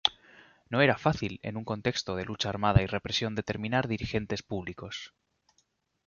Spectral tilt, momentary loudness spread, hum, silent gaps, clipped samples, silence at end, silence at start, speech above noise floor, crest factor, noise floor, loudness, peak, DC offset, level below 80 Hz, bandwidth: -5.5 dB/octave; 13 LU; none; none; under 0.1%; 1 s; 0.05 s; 44 dB; 26 dB; -73 dBFS; -30 LUFS; -4 dBFS; under 0.1%; -48 dBFS; 7.2 kHz